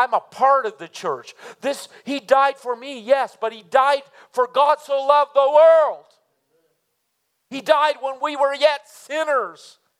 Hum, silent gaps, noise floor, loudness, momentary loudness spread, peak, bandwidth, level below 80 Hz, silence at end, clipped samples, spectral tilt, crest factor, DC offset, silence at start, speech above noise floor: none; none; -72 dBFS; -19 LUFS; 14 LU; -2 dBFS; 14 kHz; -88 dBFS; 0.5 s; under 0.1%; -2.5 dB/octave; 18 dB; under 0.1%; 0 s; 53 dB